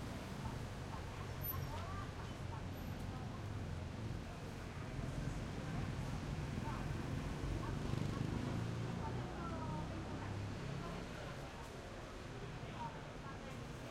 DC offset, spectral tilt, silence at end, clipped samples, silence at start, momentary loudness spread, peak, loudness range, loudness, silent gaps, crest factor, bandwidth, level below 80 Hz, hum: under 0.1%; -6 dB/octave; 0 s; under 0.1%; 0 s; 7 LU; -28 dBFS; 4 LU; -45 LUFS; none; 16 dB; 16 kHz; -54 dBFS; none